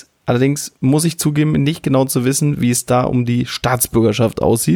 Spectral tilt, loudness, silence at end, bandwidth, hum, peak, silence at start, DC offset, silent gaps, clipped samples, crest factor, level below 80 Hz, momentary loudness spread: -5.5 dB/octave; -16 LUFS; 0 s; over 20 kHz; none; 0 dBFS; 0.25 s; under 0.1%; none; under 0.1%; 16 dB; -42 dBFS; 3 LU